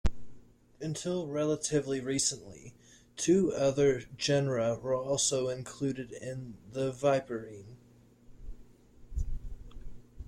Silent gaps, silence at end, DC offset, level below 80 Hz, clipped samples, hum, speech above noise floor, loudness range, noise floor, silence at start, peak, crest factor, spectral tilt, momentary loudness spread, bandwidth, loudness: none; 0 s; under 0.1%; -46 dBFS; under 0.1%; none; 29 dB; 7 LU; -60 dBFS; 0.05 s; -16 dBFS; 16 dB; -4.5 dB/octave; 20 LU; 15 kHz; -31 LUFS